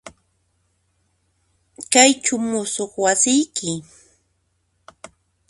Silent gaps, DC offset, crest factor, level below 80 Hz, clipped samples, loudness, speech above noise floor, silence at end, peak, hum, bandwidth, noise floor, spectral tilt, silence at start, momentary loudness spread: none; under 0.1%; 22 dB; -64 dBFS; under 0.1%; -18 LUFS; 50 dB; 1.7 s; 0 dBFS; none; 11.5 kHz; -68 dBFS; -2 dB/octave; 0.05 s; 14 LU